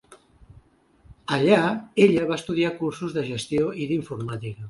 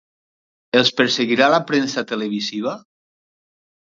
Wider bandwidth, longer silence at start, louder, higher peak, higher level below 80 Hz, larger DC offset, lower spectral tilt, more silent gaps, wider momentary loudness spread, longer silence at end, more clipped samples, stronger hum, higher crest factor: first, 11.5 kHz vs 7.8 kHz; second, 0.1 s vs 0.75 s; second, -23 LUFS vs -18 LUFS; second, -4 dBFS vs 0 dBFS; first, -56 dBFS vs -68 dBFS; neither; first, -6 dB/octave vs -4 dB/octave; neither; about the same, 12 LU vs 10 LU; second, 0 s vs 1.2 s; neither; neither; about the same, 22 dB vs 20 dB